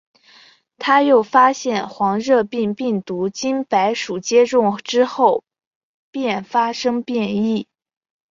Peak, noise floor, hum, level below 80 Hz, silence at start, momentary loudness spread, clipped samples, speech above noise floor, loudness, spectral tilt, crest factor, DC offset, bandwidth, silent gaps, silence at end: -2 dBFS; -50 dBFS; none; -64 dBFS; 0.8 s; 9 LU; under 0.1%; 33 dB; -18 LUFS; -4.5 dB/octave; 16 dB; under 0.1%; 7.6 kHz; 5.67-6.13 s; 0.65 s